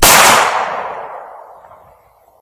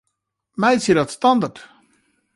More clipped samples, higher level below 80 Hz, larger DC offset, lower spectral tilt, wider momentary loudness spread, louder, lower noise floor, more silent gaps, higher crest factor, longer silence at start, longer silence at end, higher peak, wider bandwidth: first, 0.3% vs under 0.1%; first, -34 dBFS vs -58 dBFS; neither; second, -0.5 dB/octave vs -5 dB/octave; first, 24 LU vs 10 LU; first, -10 LUFS vs -18 LUFS; second, -49 dBFS vs -76 dBFS; neither; about the same, 14 dB vs 16 dB; second, 0 s vs 0.6 s; first, 1.05 s vs 0.75 s; first, 0 dBFS vs -4 dBFS; first, over 20 kHz vs 11.5 kHz